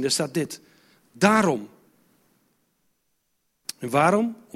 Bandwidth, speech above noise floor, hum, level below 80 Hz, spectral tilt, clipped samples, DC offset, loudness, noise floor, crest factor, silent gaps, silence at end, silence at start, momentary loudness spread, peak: 16 kHz; 51 dB; none; -66 dBFS; -4.5 dB/octave; under 0.1%; under 0.1%; -23 LUFS; -73 dBFS; 22 dB; none; 0.2 s; 0 s; 19 LU; -4 dBFS